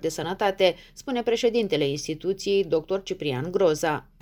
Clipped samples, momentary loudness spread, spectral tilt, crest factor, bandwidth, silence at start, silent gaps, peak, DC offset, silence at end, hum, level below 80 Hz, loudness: under 0.1%; 7 LU; -4.5 dB/octave; 18 dB; over 20 kHz; 0 s; none; -6 dBFS; under 0.1%; 0.2 s; none; -54 dBFS; -25 LUFS